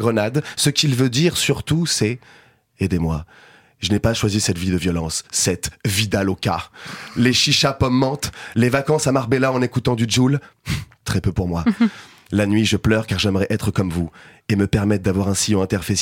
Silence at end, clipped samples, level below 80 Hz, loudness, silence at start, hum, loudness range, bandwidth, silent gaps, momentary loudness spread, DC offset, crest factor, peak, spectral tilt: 0 s; under 0.1%; -40 dBFS; -19 LUFS; 0 s; none; 3 LU; 16.5 kHz; none; 9 LU; under 0.1%; 16 dB; -2 dBFS; -4.5 dB/octave